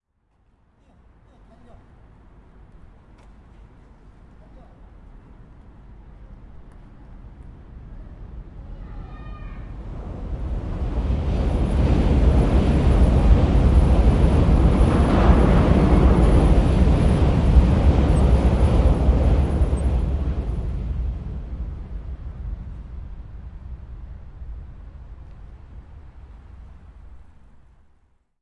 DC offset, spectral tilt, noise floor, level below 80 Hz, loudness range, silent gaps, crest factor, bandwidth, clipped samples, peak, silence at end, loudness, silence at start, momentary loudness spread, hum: under 0.1%; -8.5 dB/octave; -64 dBFS; -22 dBFS; 23 LU; none; 18 dB; 10.5 kHz; under 0.1%; -2 dBFS; 1.25 s; -19 LUFS; 5.15 s; 23 LU; none